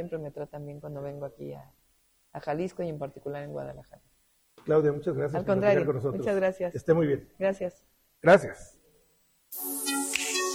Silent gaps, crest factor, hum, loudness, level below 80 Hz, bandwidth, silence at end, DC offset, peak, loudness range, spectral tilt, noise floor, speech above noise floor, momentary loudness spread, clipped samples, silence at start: none; 20 dB; none; -28 LUFS; -60 dBFS; 19 kHz; 0 s; under 0.1%; -8 dBFS; 11 LU; -4.5 dB/octave; -68 dBFS; 39 dB; 17 LU; under 0.1%; 0 s